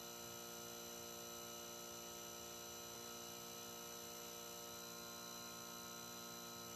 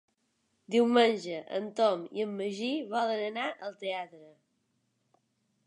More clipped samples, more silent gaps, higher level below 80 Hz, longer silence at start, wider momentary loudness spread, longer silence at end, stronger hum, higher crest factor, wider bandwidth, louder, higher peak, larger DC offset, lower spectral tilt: neither; neither; first, -80 dBFS vs -88 dBFS; second, 0 s vs 0.7 s; second, 0 LU vs 12 LU; second, 0 s vs 1.4 s; neither; second, 14 dB vs 20 dB; first, 14 kHz vs 11 kHz; second, -51 LUFS vs -31 LUFS; second, -38 dBFS vs -12 dBFS; neither; second, -1.5 dB/octave vs -4.5 dB/octave